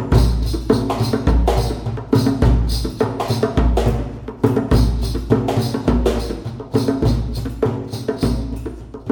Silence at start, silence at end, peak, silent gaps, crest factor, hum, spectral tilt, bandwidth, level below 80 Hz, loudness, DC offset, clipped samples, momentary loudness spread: 0 s; 0 s; -2 dBFS; none; 16 dB; none; -7 dB/octave; 18 kHz; -22 dBFS; -19 LUFS; under 0.1%; under 0.1%; 9 LU